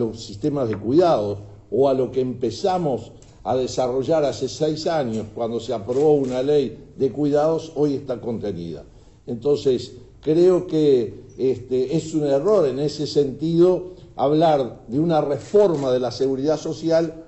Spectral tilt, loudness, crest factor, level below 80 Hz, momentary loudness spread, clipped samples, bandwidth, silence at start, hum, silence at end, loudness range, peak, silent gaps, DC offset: -7 dB/octave; -21 LUFS; 14 dB; -52 dBFS; 10 LU; under 0.1%; 8.2 kHz; 0 s; none; 0.05 s; 3 LU; -6 dBFS; none; under 0.1%